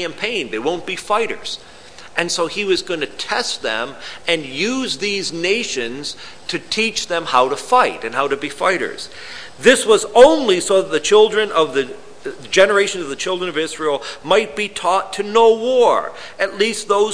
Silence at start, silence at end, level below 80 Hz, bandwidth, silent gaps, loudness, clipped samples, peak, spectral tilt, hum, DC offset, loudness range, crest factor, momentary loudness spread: 0 s; 0 s; -54 dBFS; 11 kHz; none; -17 LUFS; under 0.1%; 0 dBFS; -2.5 dB/octave; none; 1%; 7 LU; 18 dB; 13 LU